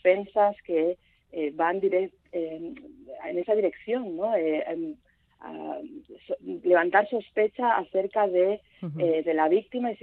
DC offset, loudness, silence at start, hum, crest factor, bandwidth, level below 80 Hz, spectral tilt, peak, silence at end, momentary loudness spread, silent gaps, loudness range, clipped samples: under 0.1%; -26 LUFS; 0.05 s; none; 18 dB; 4.3 kHz; -70 dBFS; -9 dB/octave; -8 dBFS; 0.1 s; 16 LU; none; 5 LU; under 0.1%